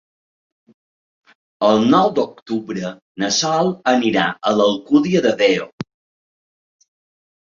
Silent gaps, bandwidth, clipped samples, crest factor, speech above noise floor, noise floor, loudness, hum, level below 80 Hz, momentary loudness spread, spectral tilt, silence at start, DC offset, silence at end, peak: 2.42-2.46 s, 3.02-3.15 s, 5.73-5.78 s; 7.6 kHz; under 0.1%; 18 dB; over 73 dB; under -90 dBFS; -17 LUFS; none; -60 dBFS; 12 LU; -4.5 dB/octave; 1.6 s; under 0.1%; 1.65 s; -2 dBFS